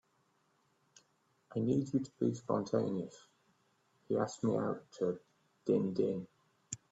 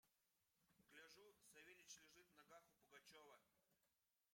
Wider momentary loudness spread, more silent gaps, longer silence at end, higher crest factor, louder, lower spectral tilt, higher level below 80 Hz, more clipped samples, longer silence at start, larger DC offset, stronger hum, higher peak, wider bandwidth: first, 12 LU vs 6 LU; neither; first, 0.15 s vs 0 s; about the same, 20 dB vs 22 dB; first, -36 LUFS vs -67 LUFS; first, -7 dB/octave vs -1 dB/octave; first, -76 dBFS vs under -90 dBFS; neither; first, 1.5 s vs 0.05 s; neither; neither; first, -18 dBFS vs -50 dBFS; second, 8.2 kHz vs 16 kHz